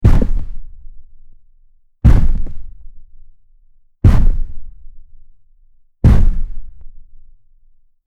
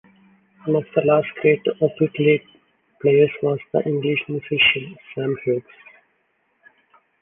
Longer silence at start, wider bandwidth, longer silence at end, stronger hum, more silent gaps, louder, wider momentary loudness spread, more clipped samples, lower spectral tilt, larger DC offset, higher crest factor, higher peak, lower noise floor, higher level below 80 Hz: second, 0 s vs 0.65 s; first, 4.3 kHz vs 3.7 kHz; second, 1.05 s vs 1.6 s; neither; neither; first, -16 LUFS vs -20 LUFS; first, 24 LU vs 10 LU; neither; about the same, -9 dB/octave vs -9 dB/octave; neither; about the same, 14 dB vs 18 dB; about the same, 0 dBFS vs -2 dBFS; second, -48 dBFS vs -67 dBFS; first, -16 dBFS vs -62 dBFS